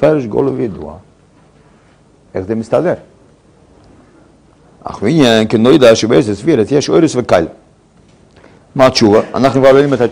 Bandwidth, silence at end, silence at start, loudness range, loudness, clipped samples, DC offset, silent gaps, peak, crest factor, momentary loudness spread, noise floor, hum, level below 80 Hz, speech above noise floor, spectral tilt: 13.5 kHz; 0 s; 0 s; 11 LU; -11 LUFS; 1%; under 0.1%; none; 0 dBFS; 12 dB; 16 LU; -47 dBFS; none; -44 dBFS; 37 dB; -5.5 dB/octave